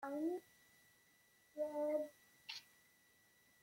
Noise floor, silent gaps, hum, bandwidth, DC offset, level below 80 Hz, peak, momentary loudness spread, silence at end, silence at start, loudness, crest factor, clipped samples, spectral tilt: -73 dBFS; none; none; 16.5 kHz; under 0.1%; under -90 dBFS; -30 dBFS; 13 LU; 1 s; 0 s; -45 LUFS; 18 dB; under 0.1%; -4 dB/octave